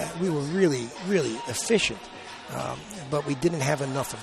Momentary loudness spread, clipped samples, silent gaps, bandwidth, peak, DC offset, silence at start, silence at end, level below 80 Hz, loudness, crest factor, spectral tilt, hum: 13 LU; under 0.1%; none; 13.5 kHz; -8 dBFS; under 0.1%; 0 s; 0 s; -56 dBFS; -27 LUFS; 18 dB; -4.5 dB/octave; none